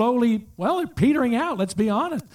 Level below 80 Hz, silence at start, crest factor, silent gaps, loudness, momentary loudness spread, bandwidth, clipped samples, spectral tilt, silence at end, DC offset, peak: -52 dBFS; 0 s; 14 dB; none; -22 LUFS; 5 LU; 15 kHz; under 0.1%; -6.5 dB/octave; 0.15 s; under 0.1%; -8 dBFS